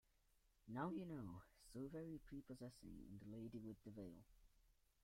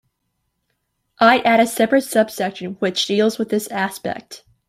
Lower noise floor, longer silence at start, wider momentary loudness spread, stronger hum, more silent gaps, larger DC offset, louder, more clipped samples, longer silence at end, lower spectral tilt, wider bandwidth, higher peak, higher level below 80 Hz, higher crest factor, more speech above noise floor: first, -80 dBFS vs -73 dBFS; second, 0.45 s vs 1.2 s; about the same, 11 LU vs 11 LU; neither; neither; neither; second, -55 LUFS vs -18 LUFS; neither; about the same, 0.3 s vs 0.3 s; first, -7.5 dB/octave vs -4 dB/octave; about the same, 16 kHz vs 16 kHz; second, -36 dBFS vs -2 dBFS; second, -72 dBFS vs -62 dBFS; about the same, 20 dB vs 18 dB; second, 26 dB vs 55 dB